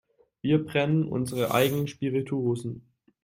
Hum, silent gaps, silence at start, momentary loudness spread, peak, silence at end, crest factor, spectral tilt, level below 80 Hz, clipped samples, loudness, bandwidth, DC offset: none; none; 0.45 s; 9 LU; -8 dBFS; 0.45 s; 18 dB; -6.5 dB/octave; -62 dBFS; under 0.1%; -27 LUFS; 16.5 kHz; under 0.1%